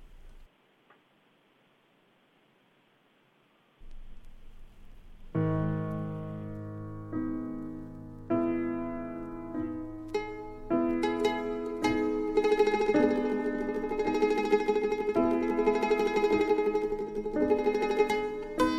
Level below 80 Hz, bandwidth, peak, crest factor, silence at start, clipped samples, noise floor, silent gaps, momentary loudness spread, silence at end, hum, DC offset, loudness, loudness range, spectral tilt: -50 dBFS; 13 kHz; -12 dBFS; 18 dB; 0 s; under 0.1%; -66 dBFS; none; 14 LU; 0 s; none; under 0.1%; -30 LUFS; 9 LU; -7 dB/octave